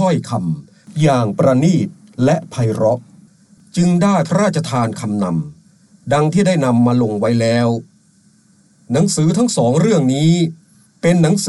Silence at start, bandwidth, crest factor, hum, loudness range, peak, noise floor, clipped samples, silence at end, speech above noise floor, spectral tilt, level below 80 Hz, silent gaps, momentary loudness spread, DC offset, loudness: 0 s; 12 kHz; 14 dB; none; 1 LU; -2 dBFS; -52 dBFS; under 0.1%; 0 s; 38 dB; -6.5 dB/octave; -52 dBFS; none; 9 LU; under 0.1%; -16 LUFS